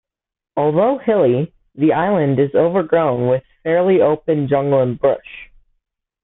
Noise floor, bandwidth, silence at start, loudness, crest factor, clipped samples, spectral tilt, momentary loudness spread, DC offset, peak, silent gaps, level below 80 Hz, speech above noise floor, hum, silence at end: -71 dBFS; 4 kHz; 0.55 s; -16 LUFS; 14 dB; under 0.1%; -13 dB/octave; 6 LU; under 0.1%; -2 dBFS; none; -54 dBFS; 56 dB; none; 0.8 s